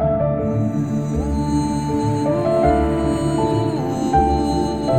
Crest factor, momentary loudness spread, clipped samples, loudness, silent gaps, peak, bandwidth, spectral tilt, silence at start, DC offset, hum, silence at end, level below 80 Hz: 16 dB; 5 LU; under 0.1%; -19 LUFS; none; -2 dBFS; 14 kHz; -7.5 dB/octave; 0 s; 0.4%; none; 0 s; -30 dBFS